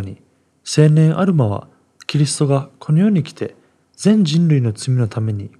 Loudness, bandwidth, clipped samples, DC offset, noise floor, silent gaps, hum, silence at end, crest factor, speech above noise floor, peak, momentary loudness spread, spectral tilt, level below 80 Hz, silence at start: -16 LUFS; 11 kHz; under 0.1%; under 0.1%; -55 dBFS; none; none; 0.1 s; 16 dB; 40 dB; 0 dBFS; 15 LU; -6.5 dB/octave; -68 dBFS; 0 s